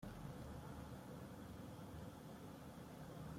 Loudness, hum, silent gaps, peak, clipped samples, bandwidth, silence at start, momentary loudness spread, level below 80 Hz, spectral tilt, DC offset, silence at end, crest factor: -55 LUFS; none; none; -40 dBFS; under 0.1%; 16.5 kHz; 0 s; 3 LU; -66 dBFS; -6.5 dB/octave; under 0.1%; 0 s; 14 dB